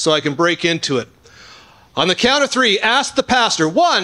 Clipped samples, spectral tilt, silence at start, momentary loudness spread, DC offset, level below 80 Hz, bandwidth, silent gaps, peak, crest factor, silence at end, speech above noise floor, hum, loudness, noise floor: under 0.1%; -3 dB/octave; 0 s; 7 LU; under 0.1%; -52 dBFS; 12 kHz; none; -2 dBFS; 14 dB; 0 s; 28 dB; none; -15 LUFS; -44 dBFS